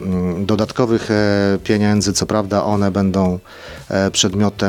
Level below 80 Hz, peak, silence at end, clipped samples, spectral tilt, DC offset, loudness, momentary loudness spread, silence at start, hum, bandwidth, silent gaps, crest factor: -44 dBFS; -2 dBFS; 0 s; under 0.1%; -5 dB/octave; under 0.1%; -17 LUFS; 5 LU; 0 s; none; 15 kHz; none; 16 dB